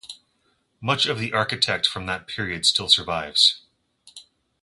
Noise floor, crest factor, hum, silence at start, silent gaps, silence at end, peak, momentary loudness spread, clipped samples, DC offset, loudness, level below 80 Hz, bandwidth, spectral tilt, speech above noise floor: -68 dBFS; 22 dB; none; 0.05 s; none; 0.4 s; -2 dBFS; 12 LU; under 0.1%; under 0.1%; -20 LUFS; -54 dBFS; 11.5 kHz; -2 dB/octave; 45 dB